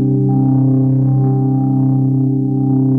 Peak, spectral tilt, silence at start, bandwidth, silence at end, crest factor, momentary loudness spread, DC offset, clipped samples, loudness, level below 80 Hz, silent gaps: -4 dBFS; -14.5 dB/octave; 0 s; 1.4 kHz; 0 s; 8 dB; 2 LU; under 0.1%; under 0.1%; -14 LUFS; -48 dBFS; none